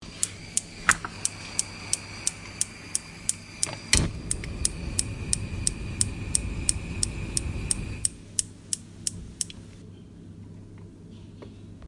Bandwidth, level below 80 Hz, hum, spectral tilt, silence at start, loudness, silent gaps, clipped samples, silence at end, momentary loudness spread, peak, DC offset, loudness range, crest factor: 11.5 kHz; -40 dBFS; none; -2 dB/octave; 0 s; -28 LUFS; none; under 0.1%; 0 s; 21 LU; 0 dBFS; under 0.1%; 6 LU; 30 dB